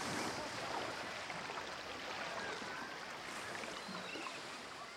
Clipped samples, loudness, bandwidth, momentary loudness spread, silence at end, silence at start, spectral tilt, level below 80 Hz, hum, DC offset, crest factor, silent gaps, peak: under 0.1%; -44 LUFS; 16 kHz; 4 LU; 0 s; 0 s; -2.5 dB/octave; -74 dBFS; none; under 0.1%; 16 dB; none; -28 dBFS